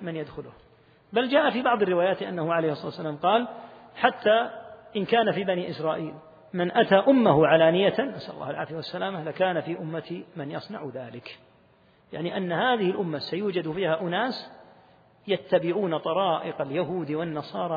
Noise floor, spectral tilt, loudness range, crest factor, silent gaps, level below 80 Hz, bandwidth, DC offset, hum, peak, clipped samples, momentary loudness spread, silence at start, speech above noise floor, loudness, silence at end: -60 dBFS; -8.5 dB/octave; 9 LU; 24 dB; none; -66 dBFS; 5 kHz; under 0.1%; none; -2 dBFS; under 0.1%; 16 LU; 0 s; 34 dB; -26 LUFS; 0 s